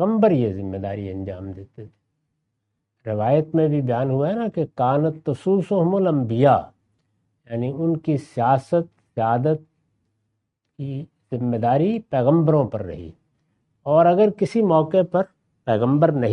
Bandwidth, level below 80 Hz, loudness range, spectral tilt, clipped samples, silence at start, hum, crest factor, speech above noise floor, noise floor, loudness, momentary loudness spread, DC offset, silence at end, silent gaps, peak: 10 kHz; -60 dBFS; 5 LU; -9.5 dB/octave; under 0.1%; 0 s; none; 18 dB; 57 dB; -76 dBFS; -21 LUFS; 14 LU; under 0.1%; 0 s; none; -2 dBFS